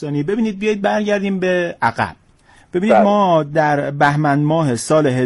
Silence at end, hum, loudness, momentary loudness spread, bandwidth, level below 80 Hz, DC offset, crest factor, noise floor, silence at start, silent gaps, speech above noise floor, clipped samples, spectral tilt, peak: 0 s; none; -16 LUFS; 7 LU; 11.5 kHz; -52 dBFS; under 0.1%; 14 dB; -50 dBFS; 0 s; none; 34 dB; under 0.1%; -6.5 dB/octave; -2 dBFS